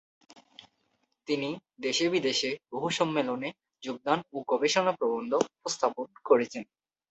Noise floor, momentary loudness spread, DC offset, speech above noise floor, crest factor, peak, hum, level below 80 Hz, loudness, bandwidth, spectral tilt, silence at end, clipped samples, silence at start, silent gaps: -75 dBFS; 13 LU; under 0.1%; 46 dB; 22 dB; -8 dBFS; none; -76 dBFS; -29 LUFS; 8.2 kHz; -3.5 dB/octave; 0.45 s; under 0.1%; 1.3 s; none